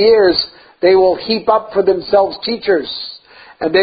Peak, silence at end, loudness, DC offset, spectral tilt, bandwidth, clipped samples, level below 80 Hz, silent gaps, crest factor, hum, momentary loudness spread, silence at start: 0 dBFS; 0 s; -14 LUFS; under 0.1%; -10 dB/octave; 5 kHz; under 0.1%; -50 dBFS; none; 14 dB; none; 13 LU; 0 s